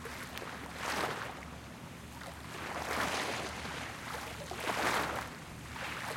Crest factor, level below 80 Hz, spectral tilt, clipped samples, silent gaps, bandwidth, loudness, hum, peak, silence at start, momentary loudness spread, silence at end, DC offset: 20 dB; -58 dBFS; -3 dB/octave; under 0.1%; none; 16.5 kHz; -38 LUFS; none; -18 dBFS; 0 s; 13 LU; 0 s; under 0.1%